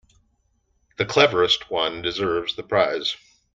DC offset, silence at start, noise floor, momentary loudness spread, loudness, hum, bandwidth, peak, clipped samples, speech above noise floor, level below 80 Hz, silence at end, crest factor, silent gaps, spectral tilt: under 0.1%; 1 s; -67 dBFS; 10 LU; -21 LUFS; none; 7.8 kHz; -2 dBFS; under 0.1%; 46 dB; -56 dBFS; 0.4 s; 22 dB; none; -4 dB/octave